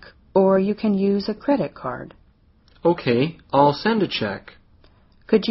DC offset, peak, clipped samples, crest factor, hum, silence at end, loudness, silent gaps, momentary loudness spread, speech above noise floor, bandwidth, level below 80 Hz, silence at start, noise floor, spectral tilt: under 0.1%; -2 dBFS; under 0.1%; 20 dB; none; 0 s; -21 LUFS; none; 13 LU; 36 dB; 6 kHz; -54 dBFS; 0.35 s; -56 dBFS; -5 dB/octave